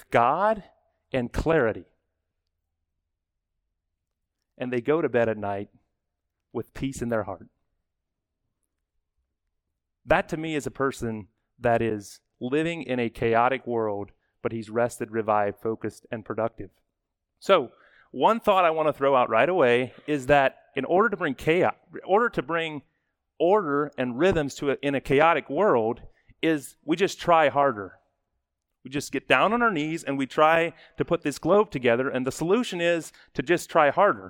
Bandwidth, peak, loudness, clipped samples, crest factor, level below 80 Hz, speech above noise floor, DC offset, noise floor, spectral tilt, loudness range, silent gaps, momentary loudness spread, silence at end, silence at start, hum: 18.5 kHz; -4 dBFS; -25 LUFS; under 0.1%; 22 dB; -52 dBFS; 58 dB; under 0.1%; -82 dBFS; -5.5 dB/octave; 9 LU; none; 14 LU; 0 s; 0.1 s; none